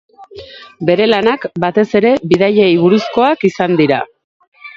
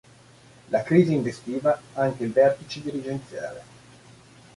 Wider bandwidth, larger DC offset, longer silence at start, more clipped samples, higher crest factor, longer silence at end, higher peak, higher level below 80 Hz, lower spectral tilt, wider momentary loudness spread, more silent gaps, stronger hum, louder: second, 7.6 kHz vs 11.5 kHz; neither; second, 0.2 s vs 0.7 s; neither; second, 14 dB vs 20 dB; second, 0.05 s vs 0.95 s; first, 0 dBFS vs -4 dBFS; first, -52 dBFS vs -62 dBFS; about the same, -7 dB/octave vs -7.5 dB/octave; second, 9 LU vs 15 LU; first, 4.24-4.40 s, 4.47-4.52 s vs none; neither; first, -12 LUFS vs -24 LUFS